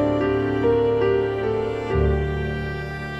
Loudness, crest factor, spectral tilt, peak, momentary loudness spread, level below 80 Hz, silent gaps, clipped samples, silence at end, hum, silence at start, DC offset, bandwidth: -22 LUFS; 14 dB; -8.5 dB/octave; -8 dBFS; 8 LU; -32 dBFS; none; under 0.1%; 0 s; none; 0 s; under 0.1%; 8.2 kHz